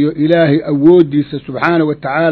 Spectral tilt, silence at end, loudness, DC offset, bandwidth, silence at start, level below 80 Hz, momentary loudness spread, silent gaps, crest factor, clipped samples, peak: -9.5 dB/octave; 0 s; -12 LUFS; under 0.1%; 6 kHz; 0 s; -50 dBFS; 8 LU; none; 12 dB; 0.3%; 0 dBFS